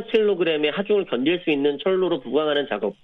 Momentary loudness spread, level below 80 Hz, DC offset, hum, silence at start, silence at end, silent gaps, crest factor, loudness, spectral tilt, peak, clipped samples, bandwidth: 2 LU; -64 dBFS; under 0.1%; none; 0 s; 0.1 s; none; 14 dB; -22 LUFS; -7.5 dB/octave; -8 dBFS; under 0.1%; 4.6 kHz